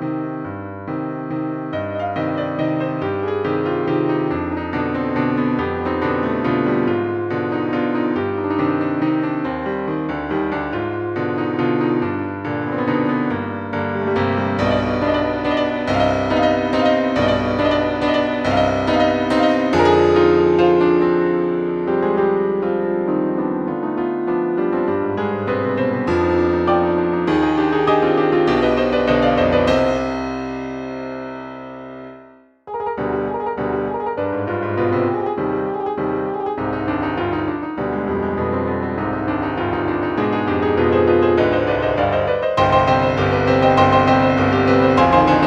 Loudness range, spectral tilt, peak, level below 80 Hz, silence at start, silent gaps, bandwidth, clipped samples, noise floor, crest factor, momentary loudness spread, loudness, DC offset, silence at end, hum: 6 LU; -7.5 dB/octave; 0 dBFS; -42 dBFS; 0 s; none; 8.2 kHz; under 0.1%; -46 dBFS; 18 dB; 10 LU; -19 LUFS; under 0.1%; 0 s; none